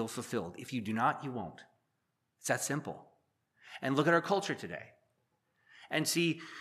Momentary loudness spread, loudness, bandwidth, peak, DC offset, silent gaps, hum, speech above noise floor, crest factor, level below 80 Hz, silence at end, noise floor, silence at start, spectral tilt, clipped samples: 17 LU; -34 LUFS; 15 kHz; -14 dBFS; under 0.1%; none; none; 48 dB; 22 dB; -78 dBFS; 0 s; -82 dBFS; 0 s; -4 dB/octave; under 0.1%